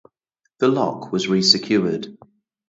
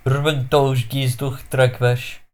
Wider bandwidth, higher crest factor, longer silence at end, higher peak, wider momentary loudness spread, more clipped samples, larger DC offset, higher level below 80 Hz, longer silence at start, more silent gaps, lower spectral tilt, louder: second, 8 kHz vs 16.5 kHz; first, 22 dB vs 16 dB; first, 0.55 s vs 0.1 s; about the same, 0 dBFS vs -2 dBFS; first, 11 LU vs 7 LU; neither; neither; second, -64 dBFS vs -44 dBFS; first, 0.6 s vs 0.05 s; neither; second, -4.5 dB/octave vs -6 dB/octave; about the same, -19 LUFS vs -19 LUFS